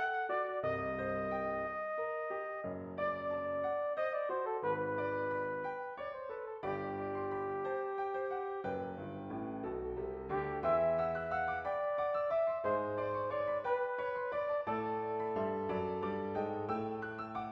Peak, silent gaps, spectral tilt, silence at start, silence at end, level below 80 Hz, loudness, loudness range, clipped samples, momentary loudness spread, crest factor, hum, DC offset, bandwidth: -20 dBFS; none; -8.5 dB/octave; 0 s; 0 s; -64 dBFS; -37 LUFS; 4 LU; under 0.1%; 7 LU; 16 dB; none; under 0.1%; 6 kHz